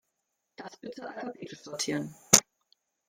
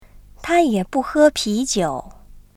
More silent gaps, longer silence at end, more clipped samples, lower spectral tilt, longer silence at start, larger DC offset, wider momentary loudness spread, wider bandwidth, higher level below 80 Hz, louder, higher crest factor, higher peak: neither; first, 0.65 s vs 0.2 s; neither; second, -1.5 dB/octave vs -4 dB/octave; first, 0.6 s vs 0.15 s; neither; first, 22 LU vs 10 LU; about the same, 16.5 kHz vs 15 kHz; second, -68 dBFS vs -44 dBFS; second, -25 LUFS vs -18 LUFS; first, 32 dB vs 16 dB; first, 0 dBFS vs -4 dBFS